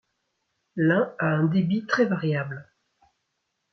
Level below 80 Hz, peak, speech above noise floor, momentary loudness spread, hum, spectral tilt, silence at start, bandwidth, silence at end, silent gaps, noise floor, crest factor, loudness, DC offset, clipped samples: -68 dBFS; -8 dBFS; 54 dB; 13 LU; none; -8 dB/octave; 0.75 s; 6.4 kHz; 1.1 s; none; -78 dBFS; 18 dB; -24 LUFS; under 0.1%; under 0.1%